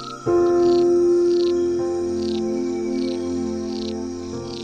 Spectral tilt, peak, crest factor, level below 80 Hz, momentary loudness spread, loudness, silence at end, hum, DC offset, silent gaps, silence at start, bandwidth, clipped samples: -6 dB/octave; -10 dBFS; 10 dB; -50 dBFS; 11 LU; -21 LUFS; 0 s; none; under 0.1%; none; 0 s; 9 kHz; under 0.1%